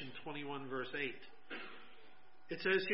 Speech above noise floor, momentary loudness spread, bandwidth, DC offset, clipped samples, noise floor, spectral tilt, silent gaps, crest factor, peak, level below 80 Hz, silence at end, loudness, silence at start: 27 dB; 21 LU; 5.6 kHz; 0.3%; under 0.1%; -66 dBFS; -2 dB/octave; none; 22 dB; -20 dBFS; -82 dBFS; 0 s; -42 LUFS; 0 s